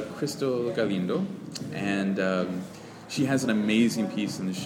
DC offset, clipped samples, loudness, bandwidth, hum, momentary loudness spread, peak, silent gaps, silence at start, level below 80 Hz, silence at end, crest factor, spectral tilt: under 0.1%; under 0.1%; -28 LUFS; 16.5 kHz; none; 12 LU; -12 dBFS; none; 0 s; -68 dBFS; 0 s; 16 dB; -5.5 dB/octave